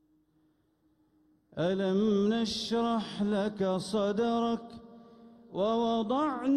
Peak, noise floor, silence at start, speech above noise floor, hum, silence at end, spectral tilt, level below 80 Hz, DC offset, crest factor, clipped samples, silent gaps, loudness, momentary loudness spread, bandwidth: -18 dBFS; -71 dBFS; 1.55 s; 42 dB; none; 0 s; -6 dB/octave; -64 dBFS; under 0.1%; 12 dB; under 0.1%; none; -30 LUFS; 8 LU; 11 kHz